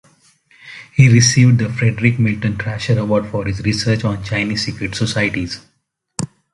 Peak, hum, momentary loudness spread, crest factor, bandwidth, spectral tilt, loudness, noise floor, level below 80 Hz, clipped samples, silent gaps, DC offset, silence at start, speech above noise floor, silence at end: 0 dBFS; none; 16 LU; 16 dB; 11.5 kHz; -5 dB/octave; -16 LUFS; -53 dBFS; -42 dBFS; under 0.1%; none; under 0.1%; 0.65 s; 38 dB; 0.3 s